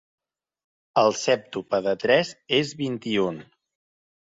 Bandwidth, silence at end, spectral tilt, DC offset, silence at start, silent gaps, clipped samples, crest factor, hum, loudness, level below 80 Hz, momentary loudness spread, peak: 7.8 kHz; 0.9 s; -4 dB/octave; under 0.1%; 0.95 s; none; under 0.1%; 20 dB; none; -24 LUFS; -66 dBFS; 8 LU; -6 dBFS